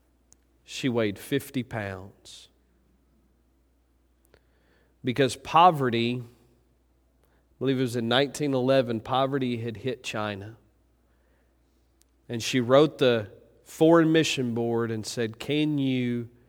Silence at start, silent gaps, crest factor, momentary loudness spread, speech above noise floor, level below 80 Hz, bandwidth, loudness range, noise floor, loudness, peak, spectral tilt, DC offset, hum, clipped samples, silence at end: 0.7 s; none; 22 dB; 16 LU; 41 dB; -64 dBFS; 18.5 kHz; 11 LU; -66 dBFS; -25 LUFS; -6 dBFS; -5.5 dB/octave; under 0.1%; none; under 0.1%; 0.2 s